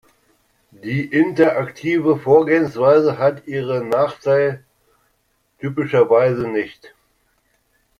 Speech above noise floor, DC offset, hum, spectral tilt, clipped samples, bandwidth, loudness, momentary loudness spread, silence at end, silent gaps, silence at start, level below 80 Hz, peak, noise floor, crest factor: 49 dB; under 0.1%; none; -8 dB/octave; under 0.1%; 11 kHz; -17 LUFS; 12 LU; 1.1 s; none; 0.85 s; -58 dBFS; -2 dBFS; -65 dBFS; 18 dB